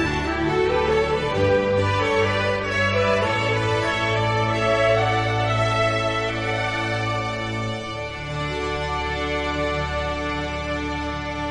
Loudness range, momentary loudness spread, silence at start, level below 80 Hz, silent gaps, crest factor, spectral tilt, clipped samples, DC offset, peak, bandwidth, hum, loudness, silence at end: 5 LU; 7 LU; 0 s; -38 dBFS; none; 14 dB; -5.5 dB/octave; under 0.1%; under 0.1%; -8 dBFS; 11 kHz; none; -22 LUFS; 0 s